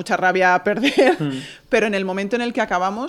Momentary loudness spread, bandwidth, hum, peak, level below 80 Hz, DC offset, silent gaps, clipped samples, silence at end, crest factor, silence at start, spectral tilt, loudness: 7 LU; 13 kHz; none; -4 dBFS; -56 dBFS; under 0.1%; none; under 0.1%; 0 s; 16 dB; 0 s; -5 dB/octave; -19 LUFS